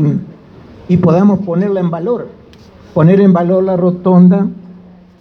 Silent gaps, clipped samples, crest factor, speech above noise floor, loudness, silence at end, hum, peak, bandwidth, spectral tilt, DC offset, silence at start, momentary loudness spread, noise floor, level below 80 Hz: none; under 0.1%; 12 dB; 28 dB; -11 LUFS; 0.45 s; none; 0 dBFS; 4.3 kHz; -11 dB/octave; under 0.1%; 0 s; 12 LU; -39 dBFS; -50 dBFS